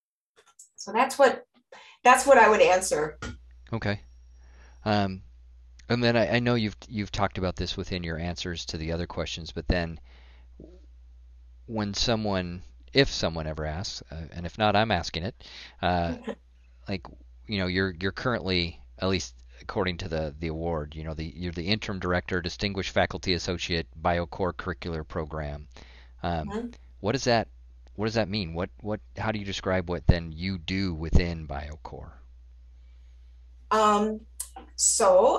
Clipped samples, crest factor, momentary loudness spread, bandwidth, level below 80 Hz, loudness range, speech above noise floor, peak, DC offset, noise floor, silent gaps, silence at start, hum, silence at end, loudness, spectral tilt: under 0.1%; 22 dB; 15 LU; 15.5 kHz; -42 dBFS; 9 LU; 37 dB; -6 dBFS; under 0.1%; -64 dBFS; none; 0.6 s; none; 0 s; -27 LUFS; -4.5 dB/octave